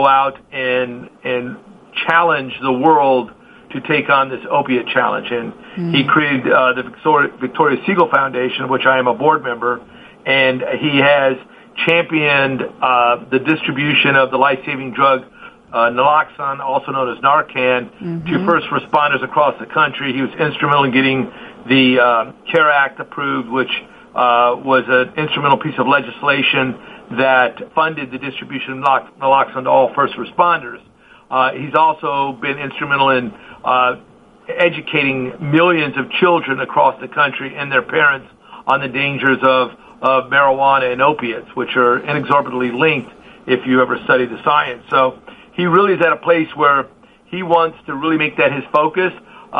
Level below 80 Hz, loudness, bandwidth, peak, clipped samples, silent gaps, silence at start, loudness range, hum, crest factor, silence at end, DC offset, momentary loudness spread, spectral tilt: -58 dBFS; -15 LUFS; 5 kHz; 0 dBFS; under 0.1%; none; 0 s; 2 LU; none; 16 dB; 0 s; under 0.1%; 10 LU; -7.5 dB/octave